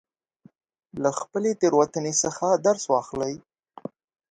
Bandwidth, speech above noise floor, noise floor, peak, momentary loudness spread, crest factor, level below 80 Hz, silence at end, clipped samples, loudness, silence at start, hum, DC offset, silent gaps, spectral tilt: 9.6 kHz; 34 dB; -58 dBFS; -6 dBFS; 20 LU; 20 dB; -66 dBFS; 0.95 s; under 0.1%; -24 LUFS; 0.95 s; none; under 0.1%; none; -4 dB/octave